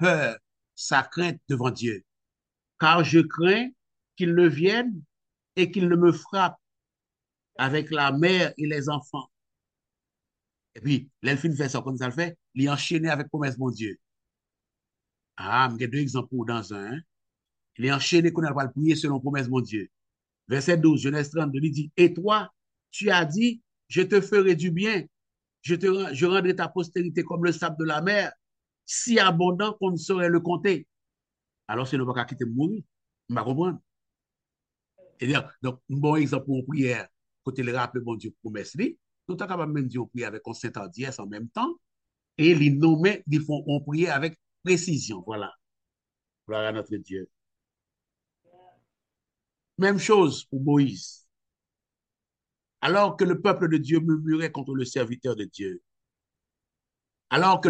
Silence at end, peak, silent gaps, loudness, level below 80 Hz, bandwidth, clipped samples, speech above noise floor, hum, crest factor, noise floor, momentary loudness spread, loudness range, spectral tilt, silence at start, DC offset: 0 s; -4 dBFS; none; -25 LUFS; -72 dBFS; 9.2 kHz; under 0.1%; 65 dB; none; 22 dB; -90 dBFS; 15 LU; 8 LU; -5.5 dB/octave; 0 s; under 0.1%